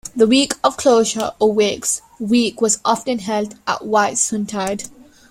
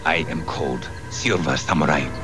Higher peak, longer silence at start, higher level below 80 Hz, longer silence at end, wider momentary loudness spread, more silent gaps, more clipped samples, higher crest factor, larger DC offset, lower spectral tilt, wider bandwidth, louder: about the same, -2 dBFS vs -4 dBFS; about the same, 0.05 s vs 0 s; second, -54 dBFS vs -42 dBFS; first, 0.4 s vs 0 s; about the same, 9 LU vs 8 LU; neither; neither; about the same, 16 dB vs 18 dB; second, under 0.1% vs 1%; second, -3 dB/octave vs -4.5 dB/octave; first, 16 kHz vs 11 kHz; first, -17 LUFS vs -22 LUFS